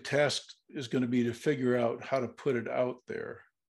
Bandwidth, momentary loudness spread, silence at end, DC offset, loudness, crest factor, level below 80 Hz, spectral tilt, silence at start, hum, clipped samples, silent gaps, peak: 12.5 kHz; 13 LU; 0.35 s; under 0.1%; -32 LUFS; 18 dB; -74 dBFS; -5.5 dB/octave; 0 s; none; under 0.1%; none; -14 dBFS